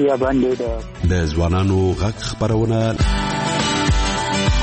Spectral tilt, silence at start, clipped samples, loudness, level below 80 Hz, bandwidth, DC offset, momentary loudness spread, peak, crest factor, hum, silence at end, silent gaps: -5.5 dB/octave; 0 s; under 0.1%; -19 LUFS; -26 dBFS; 8.8 kHz; under 0.1%; 5 LU; -6 dBFS; 12 dB; none; 0 s; none